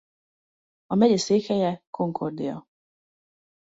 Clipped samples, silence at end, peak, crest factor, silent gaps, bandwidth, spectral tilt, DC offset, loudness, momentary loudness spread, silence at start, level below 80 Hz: under 0.1%; 1.15 s; -6 dBFS; 20 dB; 1.87-1.93 s; 8 kHz; -6 dB/octave; under 0.1%; -24 LUFS; 12 LU; 0.9 s; -68 dBFS